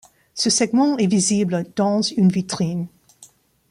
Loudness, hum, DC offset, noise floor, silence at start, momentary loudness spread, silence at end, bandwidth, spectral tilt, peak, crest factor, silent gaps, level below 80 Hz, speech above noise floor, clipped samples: -19 LUFS; none; under 0.1%; -51 dBFS; 0.35 s; 8 LU; 0.45 s; 11.5 kHz; -4.5 dB/octave; -6 dBFS; 14 dB; none; -60 dBFS; 32 dB; under 0.1%